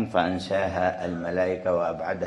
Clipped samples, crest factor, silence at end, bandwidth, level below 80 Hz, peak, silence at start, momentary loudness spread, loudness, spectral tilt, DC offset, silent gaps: under 0.1%; 18 dB; 0 s; 11 kHz; -50 dBFS; -8 dBFS; 0 s; 4 LU; -26 LUFS; -6.5 dB/octave; under 0.1%; none